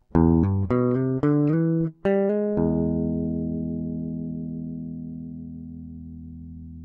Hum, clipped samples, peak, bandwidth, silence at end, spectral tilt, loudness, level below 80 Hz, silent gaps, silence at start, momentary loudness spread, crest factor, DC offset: none; under 0.1%; -6 dBFS; 3.2 kHz; 0 s; -12 dB/octave; -24 LUFS; -42 dBFS; none; 0.15 s; 18 LU; 18 dB; under 0.1%